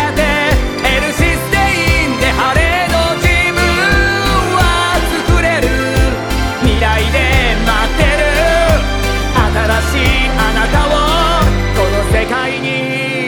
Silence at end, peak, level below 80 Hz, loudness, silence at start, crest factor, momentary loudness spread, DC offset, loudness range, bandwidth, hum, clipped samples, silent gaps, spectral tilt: 0 s; 0 dBFS; -18 dBFS; -12 LUFS; 0 s; 12 dB; 3 LU; under 0.1%; 1 LU; 19.5 kHz; none; under 0.1%; none; -4.5 dB/octave